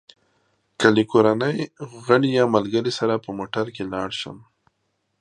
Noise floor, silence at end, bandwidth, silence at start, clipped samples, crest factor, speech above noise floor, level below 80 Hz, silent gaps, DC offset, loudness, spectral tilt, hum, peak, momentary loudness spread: -73 dBFS; 0.85 s; 10.5 kHz; 0.8 s; under 0.1%; 22 dB; 52 dB; -60 dBFS; none; under 0.1%; -21 LUFS; -6 dB/octave; none; 0 dBFS; 12 LU